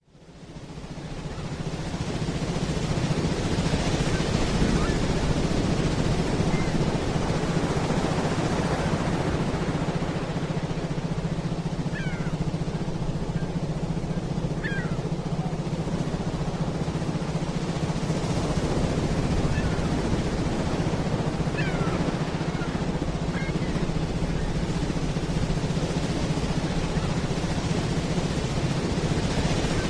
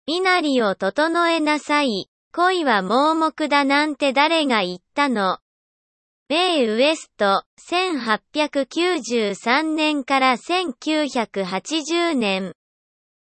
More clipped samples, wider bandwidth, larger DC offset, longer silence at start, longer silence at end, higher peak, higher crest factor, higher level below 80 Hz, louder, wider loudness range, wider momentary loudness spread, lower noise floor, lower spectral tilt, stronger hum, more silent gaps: neither; first, 11 kHz vs 8.8 kHz; neither; about the same, 0.15 s vs 0.05 s; second, 0 s vs 0.9 s; second, -8 dBFS vs -4 dBFS; about the same, 18 dB vs 16 dB; first, -34 dBFS vs -70 dBFS; second, -27 LUFS vs -20 LUFS; about the same, 4 LU vs 3 LU; about the same, 4 LU vs 6 LU; second, -47 dBFS vs under -90 dBFS; first, -6 dB/octave vs -3.5 dB/octave; neither; second, none vs 2.08-2.31 s, 5.42-6.26 s, 7.46-7.57 s